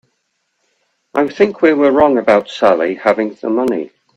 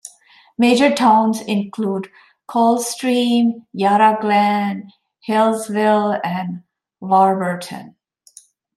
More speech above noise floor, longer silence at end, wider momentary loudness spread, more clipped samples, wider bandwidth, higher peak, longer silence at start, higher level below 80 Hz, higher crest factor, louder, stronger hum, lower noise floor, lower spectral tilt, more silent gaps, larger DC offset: first, 55 dB vs 33 dB; second, 0.3 s vs 0.85 s; second, 7 LU vs 17 LU; neither; second, 9.4 kHz vs 14 kHz; about the same, 0 dBFS vs -2 dBFS; first, 1.15 s vs 0.6 s; first, -52 dBFS vs -68 dBFS; about the same, 14 dB vs 16 dB; first, -14 LUFS vs -17 LUFS; neither; first, -68 dBFS vs -50 dBFS; about the same, -6 dB/octave vs -5 dB/octave; neither; neither